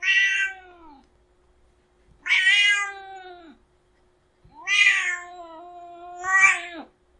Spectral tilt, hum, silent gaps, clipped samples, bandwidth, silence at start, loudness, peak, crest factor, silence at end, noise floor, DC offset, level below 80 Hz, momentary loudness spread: 2 dB/octave; none; none; under 0.1%; 11 kHz; 0 s; -19 LUFS; -4 dBFS; 20 dB; 0.35 s; -63 dBFS; under 0.1%; -64 dBFS; 26 LU